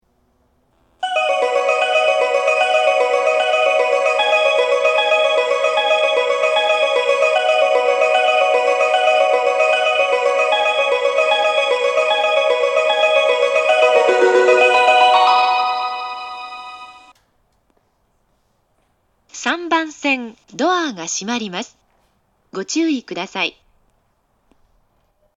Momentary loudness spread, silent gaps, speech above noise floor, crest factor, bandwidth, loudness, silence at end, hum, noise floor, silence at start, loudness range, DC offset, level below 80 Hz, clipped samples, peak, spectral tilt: 11 LU; none; 41 dB; 16 dB; 10.5 kHz; -15 LUFS; 1.85 s; none; -63 dBFS; 1 s; 12 LU; under 0.1%; -68 dBFS; under 0.1%; 0 dBFS; -1.5 dB/octave